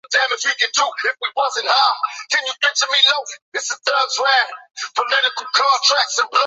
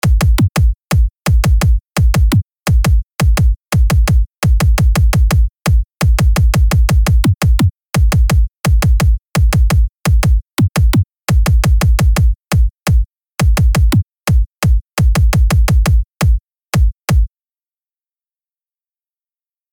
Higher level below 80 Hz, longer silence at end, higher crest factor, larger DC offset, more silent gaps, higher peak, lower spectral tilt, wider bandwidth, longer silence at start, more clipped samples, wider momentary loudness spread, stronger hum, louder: second, -84 dBFS vs -14 dBFS; second, 0 s vs 2.45 s; first, 16 dB vs 8 dB; neither; first, 3.42-3.52 s vs none; about the same, -2 dBFS vs -4 dBFS; second, 4 dB/octave vs -6 dB/octave; second, 8.2 kHz vs 19 kHz; about the same, 0.1 s vs 0.05 s; neither; first, 10 LU vs 4 LU; neither; second, -17 LUFS vs -14 LUFS